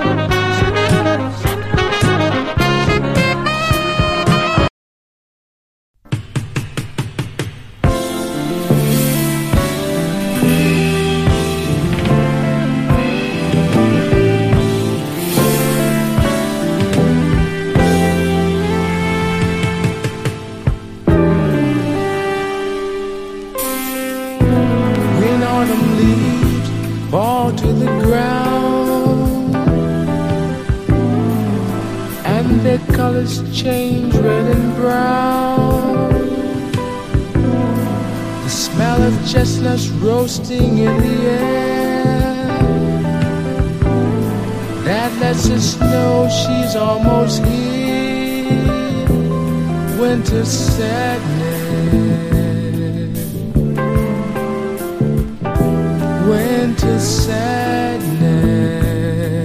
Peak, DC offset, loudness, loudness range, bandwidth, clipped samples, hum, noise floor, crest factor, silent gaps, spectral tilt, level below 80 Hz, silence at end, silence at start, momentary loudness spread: 0 dBFS; under 0.1%; -16 LUFS; 3 LU; 15.5 kHz; under 0.1%; none; under -90 dBFS; 14 dB; 4.70-5.94 s; -6 dB/octave; -28 dBFS; 0 s; 0 s; 7 LU